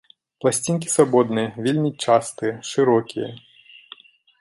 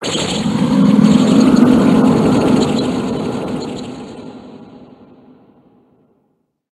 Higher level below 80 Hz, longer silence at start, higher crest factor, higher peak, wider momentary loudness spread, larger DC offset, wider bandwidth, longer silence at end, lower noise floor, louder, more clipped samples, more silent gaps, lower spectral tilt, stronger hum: second, -66 dBFS vs -44 dBFS; first, 0.45 s vs 0 s; first, 20 dB vs 14 dB; about the same, -2 dBFS vs 0 dBFS; second, 10 LU vs 19 LU; neither; about the same, 12 kHz vs 12.5 kHz; second, 1 s vs 1.9 s; second, -47 dBFS vs -64 dBFS; second, -21 LUFS vs -13 LUFS; neither; neither; about the same, -5 dB/octave vs -6 dB/octave; neither